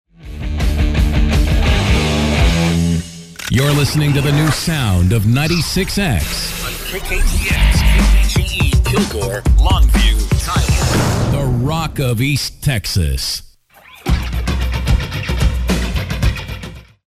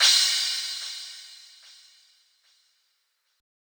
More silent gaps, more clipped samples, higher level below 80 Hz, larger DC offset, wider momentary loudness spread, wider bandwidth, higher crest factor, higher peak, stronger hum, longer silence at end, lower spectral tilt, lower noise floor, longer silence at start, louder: neither; neither; first, -18 dBFS vs under -90 dBFS; neither; second, 8 LU vs 26 LU; second, 15.5 kHz vs over 20 kHz; second, 12 dB vs 22 dB; first, -2 dBFS vs -6 dBFS; neither; second, 0.25 s vs 2.35 s; first, -5 dB/octave vs 10 dB/octave; second, -43 dBFS vs -73 dBFS; first, 0.2 s vs 0 s; first, -16 LUFS vs -23 LUFS